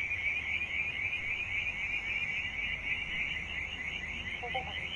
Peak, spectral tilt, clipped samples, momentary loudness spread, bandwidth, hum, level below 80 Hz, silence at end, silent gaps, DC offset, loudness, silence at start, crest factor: -22 dBFS; -3 dB/octave; under 0.1%; 5 LU; 11 kHz; none; -52 dBFS; 0 s; none; under 0.1%; -33 LUFS; 0 s; 14 dB